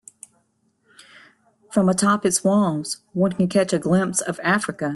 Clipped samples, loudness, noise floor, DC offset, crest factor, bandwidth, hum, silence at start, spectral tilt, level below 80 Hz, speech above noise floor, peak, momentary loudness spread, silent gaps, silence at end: under 0.1%; -20 LUFS; -66 dBFS; under 0.1%; 16 dB; 12.5 kHz; none; 1.7 s; -5 dB/octave; -60 dBFS; 46 dB; -6 dBFS; 5 LU; none; 0 s